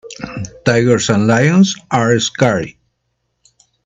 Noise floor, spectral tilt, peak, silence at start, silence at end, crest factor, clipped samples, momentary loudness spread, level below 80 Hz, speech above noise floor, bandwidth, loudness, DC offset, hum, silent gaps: -69 dBFS; -5 dB/octave; 0 dBFS; 0.05 s; 1.15 s; 16 dB; under 0.1%; 15 LU; -50 dBFS; 56 dB; 8.4 kHz; -13 LUFS; under 0.1%; none; none